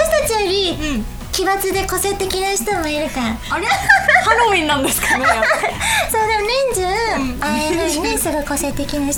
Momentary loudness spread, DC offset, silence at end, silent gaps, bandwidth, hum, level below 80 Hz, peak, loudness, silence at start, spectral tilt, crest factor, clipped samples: 8 LU; under 0.1%; 0 s; none; over 20 kHz; none; -32 dBFS; 0 dBFS; -16 LUFS; 0 s; -2.5 dB/octave; 16 dB; under 0.1%